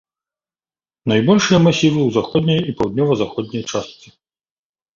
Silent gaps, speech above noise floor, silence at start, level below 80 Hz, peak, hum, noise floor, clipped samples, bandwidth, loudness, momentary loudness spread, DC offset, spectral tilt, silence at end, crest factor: none; over 74 dB; 1.05 s; -50 dBFS; -2 dBFS; none; under -90 dBFS; under 0.1%; 7.6 kHz; -17 LUFS; 12 LU; under 0.1%; -6 dB/octave; 1.05 s; 16 dB